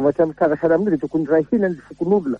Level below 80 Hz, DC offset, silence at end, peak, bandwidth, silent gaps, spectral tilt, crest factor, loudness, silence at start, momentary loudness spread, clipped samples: -54 dBFS; under 0.1%; 0 s; -4 dBFS; 6.6 kHz; none; -10 dB/octave; 14 dB; -19 LUFS; 0 s; 4 LU; under 0.1%